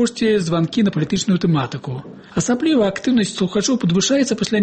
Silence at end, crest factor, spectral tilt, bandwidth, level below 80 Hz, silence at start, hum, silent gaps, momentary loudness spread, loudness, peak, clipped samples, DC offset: 0 s; 12 dB; -5 dB/octave; 8.8 kHz; -50 dBFS; 0 s; none; none; 9 LU; -18 LUFS; -4 dBFS; under 0.1%; under 0.1%